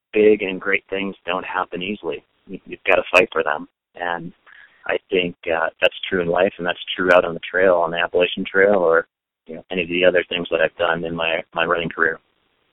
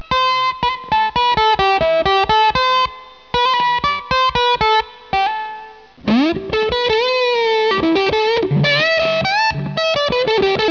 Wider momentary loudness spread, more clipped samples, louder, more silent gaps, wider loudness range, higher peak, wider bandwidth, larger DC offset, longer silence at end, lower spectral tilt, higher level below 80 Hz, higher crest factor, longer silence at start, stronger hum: first, 13 LU vs 5 LU; neither; second, -20 LUFS vs -15 LUFS; neither; about the same, 4 LU vs 2 LU; first, 0 dBFS vs -4 dBFS; first, 10.5 kHz vs 5.4 kHz; second, under 0.1% vs 0.2%; first, 0.55 s vs 0 s; about the same, -5.5 dB/octave vs -5 dB/octave; second, -54 dBFS vs -40 dBFS; first, 20 dB vs 12 dB; about the same, 0.15 s vs 0.1 s; neither